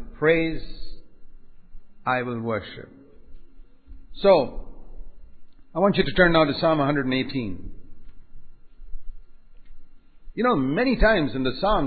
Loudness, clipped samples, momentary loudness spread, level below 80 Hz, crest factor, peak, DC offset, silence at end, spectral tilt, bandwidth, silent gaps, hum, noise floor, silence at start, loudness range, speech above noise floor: -22 LUFS; under 0.1%; 19 LU; -38 dBFS; 20 dB; -4 dBFS; under 0.1%; 0 s; -10.5 dB/octave; 4.8 kHz; none; none; -43 dBFS; 0 s; 10 LU; 21 dB